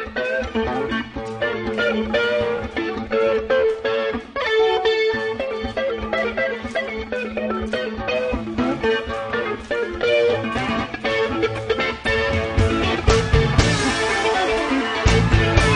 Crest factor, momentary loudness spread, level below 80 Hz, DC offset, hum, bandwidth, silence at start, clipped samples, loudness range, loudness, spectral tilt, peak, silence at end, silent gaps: 20 dB; 7 LU; -32 dBFS; under 0.1%; none; 10.5 kHz; 0 s; under 0.1%; 5 LU; -21 LUFS; -5 dB/octave; 0 dBFS; 0 s; none